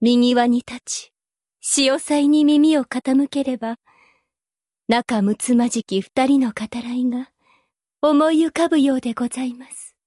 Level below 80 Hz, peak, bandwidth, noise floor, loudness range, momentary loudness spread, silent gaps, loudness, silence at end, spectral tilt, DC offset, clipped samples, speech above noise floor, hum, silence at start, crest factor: -62 dBFS; -6 dBFS; 11.5 kHz; under -90 dBFS; 3 LU; 13 LU; none; -19 LUFS; 0.2 s; -4 dB/octave; under 0.1%; under 0.1%; over 72 dB; none; 0 s; 14 dB